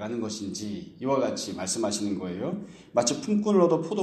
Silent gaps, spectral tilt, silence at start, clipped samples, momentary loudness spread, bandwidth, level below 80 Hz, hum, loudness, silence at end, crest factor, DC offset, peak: none; -4.5 dB/octave; 0 s; under 0.1%; 12 LU; 13 kHz; -66 dBFS; none; -27 LUFS; 0 s; 18 dB; under 0.1%; -8 dBFS